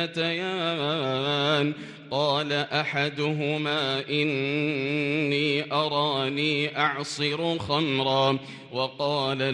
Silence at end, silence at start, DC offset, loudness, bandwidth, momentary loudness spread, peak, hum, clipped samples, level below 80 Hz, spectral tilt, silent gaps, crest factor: 0 s; 0 s; under 0.1%; -26 LUFS; 11 kHz; 4 LU; -10 dBFS; none; under 0.1%; -68 dBFS; -5 dB/octave; none; 16 dB